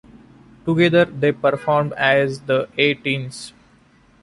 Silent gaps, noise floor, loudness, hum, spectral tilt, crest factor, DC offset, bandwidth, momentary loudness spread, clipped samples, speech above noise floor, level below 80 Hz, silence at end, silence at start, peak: none; -53 dBFS; -18 LUFS; none; -6 dB/octave; 18 dB; under 0.1%; 11.5 kHz; 14 LU; under 0.1%; 35 dB; -56 dBFS; 0.75 s; 0.65 s; -2 dBFS